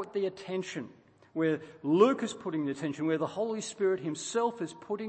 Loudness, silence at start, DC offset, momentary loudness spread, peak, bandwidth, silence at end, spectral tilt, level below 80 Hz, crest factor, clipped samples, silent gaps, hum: -31 LUFS; 0 s; under 0.1%; 13 LU; -12 dBFS; 8.8 kHz; 0 s; -5.5 dB/octave; -78 dBFS; 20 dB; under 0.1%; none; none